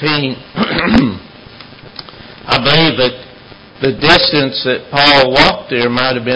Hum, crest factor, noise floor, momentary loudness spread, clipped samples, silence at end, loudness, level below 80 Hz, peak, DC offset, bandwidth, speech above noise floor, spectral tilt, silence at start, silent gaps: none; 14 dB; -37 dBFS; 23 LU; 0.3%; 0 s; -11 LUFS; -36 dBFS; 0 dBFS; under 0.1%; 8 kHz; 25 dB; -5.5 dB/octave; 0 s; none